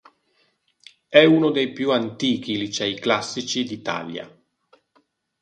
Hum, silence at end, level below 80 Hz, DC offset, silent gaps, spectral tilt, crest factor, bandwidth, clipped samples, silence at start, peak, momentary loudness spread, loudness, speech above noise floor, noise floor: none; 1.15 s; -66 dBFS; under 0.1%; none; -4.5 dB/octave; 22 dB; 9.8 kHz; under 0.1%; 1.1 s; 0 dBFS; 13 LU; -21 LUFS; 45 dB; -66 dBFS